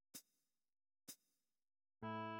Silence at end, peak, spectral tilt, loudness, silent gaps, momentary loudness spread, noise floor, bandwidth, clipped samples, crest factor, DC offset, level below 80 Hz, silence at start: 0 s; -38 dBFS; -4.5 dB/octave; -55 LUFS; none; 13 LU; -90 dBFS; 16.5 kHz; under 0.1%; 18 dB; under 0.1%; -86 dBFS; 0.15 s